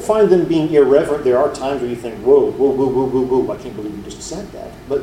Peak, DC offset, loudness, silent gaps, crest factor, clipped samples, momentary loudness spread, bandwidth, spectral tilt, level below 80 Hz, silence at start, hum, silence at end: 0 dBFS; under 0.1%; -16 LUFS; none; 16 dB; under 0.1%; 15 LU; 12.5 kHz; -6.5 dB/octave; -44 dBFS; 0 s; none; 0 s